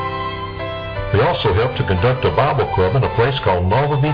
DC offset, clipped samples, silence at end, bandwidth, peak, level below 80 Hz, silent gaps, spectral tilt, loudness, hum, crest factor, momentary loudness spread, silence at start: under 0.1%; under 0.1%; 0 s; 5.2 kHz; -2 dBFS; -34 dBFS; none; -9 dB/octave; -18 LUFS; none; 14 dB; 9 LU; 0 s